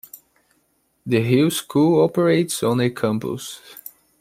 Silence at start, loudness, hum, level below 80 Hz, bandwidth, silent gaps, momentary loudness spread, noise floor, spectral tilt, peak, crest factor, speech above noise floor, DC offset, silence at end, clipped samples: 0.15 s; -19 LUFS; none; -60 dBFS; 16 kHz; none; 21 LU; -66 dBFS; -6 dB/octave; -4 dBFS; 16 dB; 47 dB; under 0.1%; 0.45 s; under 0.1%